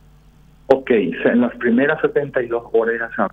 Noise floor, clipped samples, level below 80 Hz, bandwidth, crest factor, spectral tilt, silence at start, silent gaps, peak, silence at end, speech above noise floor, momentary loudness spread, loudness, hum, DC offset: -48 dBFS; under 0.1%; -52 dBFS; 5.2 kHz; 18 dB; -8 dB/octave; 0.7 s; none; 0 dBFS; 0.05 s; 31 dB; 5 LU; -18 LUFS; none; under 0.1%